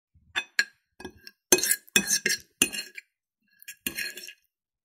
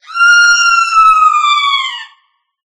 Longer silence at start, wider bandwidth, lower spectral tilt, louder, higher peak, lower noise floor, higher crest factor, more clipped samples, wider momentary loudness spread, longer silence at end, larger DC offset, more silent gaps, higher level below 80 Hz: first, 0.35 s vs 0.1 s; first, 16 kHz vs 11 kHz; first, -0.5 dB/octave vs 6.5 dB/octave; second, -26 LUFS vs -7 LUFS; about the same, -2 dBFS vs 0 dBFS; first, -75 dBFS vs -56 dBFS; first, 30 dB vs 10 dB; neither; first, 24 LU vs 9 LU; second, 0.55 s vs 0.7 s; neither; neither; second, -64 dBFS vs -54 dBFS